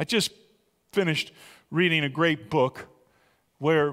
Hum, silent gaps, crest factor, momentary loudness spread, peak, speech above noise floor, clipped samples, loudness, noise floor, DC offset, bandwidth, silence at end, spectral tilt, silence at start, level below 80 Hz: none; none; 18 dB; 8 LU; -8 dBFS; 41 dB; under 0.1%; -26 LUFS; -66 dBFS; under 0.1%; 16 kHz; 0 s; -5 dB/octave; 0 s; -66 dBFS